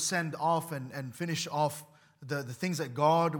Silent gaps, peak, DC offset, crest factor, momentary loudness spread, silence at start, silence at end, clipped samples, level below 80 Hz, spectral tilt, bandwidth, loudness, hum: none; -12 dBFS; under 0.1%; 18 dB; 11 LU; 0 s; 0 s; under 0.1%; -80 dBFS; -4.5 dB/octave; 18 kHz; -32 LUFS; none